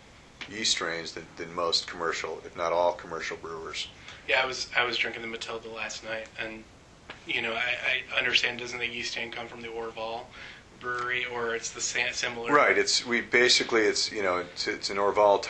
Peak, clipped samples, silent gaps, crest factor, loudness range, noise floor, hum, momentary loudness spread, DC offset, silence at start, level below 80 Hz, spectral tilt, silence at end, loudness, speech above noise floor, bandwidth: -6 dBFS; under 0.1%; none; 22 dB; 7 LU; -49 dBFS; none; 16 LU; under 0.1%; 0.05 s; -60 dBFS; -1.5 dB/octave; 0 s; -27 LUFS; 20 dB; 10.5 kHz